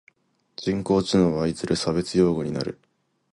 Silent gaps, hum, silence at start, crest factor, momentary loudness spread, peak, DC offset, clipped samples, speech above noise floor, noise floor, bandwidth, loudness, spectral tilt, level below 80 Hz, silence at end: none; none; 0.6 s; 18 dB; 10 LU; -8 dBFS; under 0.1%; under 0.1%; 39 dB; -62 dBFS; 11.5 kHz; -24 LUFS; -6 dB/octave; -50 dBFS; 0.6 s